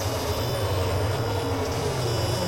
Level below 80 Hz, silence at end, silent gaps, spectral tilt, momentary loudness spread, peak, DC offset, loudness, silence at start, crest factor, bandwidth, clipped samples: -40 dBFS; 0 s; none; -5 dB/octave; 1 LU; -14 dBFS; under 0.1%; -26 LUFS; 0 s; 12 dB; 16 kHz; under 0.1%